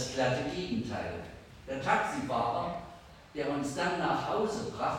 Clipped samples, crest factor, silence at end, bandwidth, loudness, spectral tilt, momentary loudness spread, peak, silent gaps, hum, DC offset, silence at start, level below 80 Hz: under 0.1%; 18 dB; 0 s; 16.5 kHz; -33 LUFS; -5 dB/octave; 14 LU; -14 dBFS; none; none; under 0.1%; 0 s; -56 dBFS